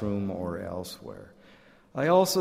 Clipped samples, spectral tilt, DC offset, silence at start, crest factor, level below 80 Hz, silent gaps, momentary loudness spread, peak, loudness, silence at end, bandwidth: under 0.1%; -5 dB/octave; under 0.1%; 0 s; 20 dB; -58 dBFS; none; 21 LU; -8 dBFS; -28 LUFS; 0 s; 16 kHz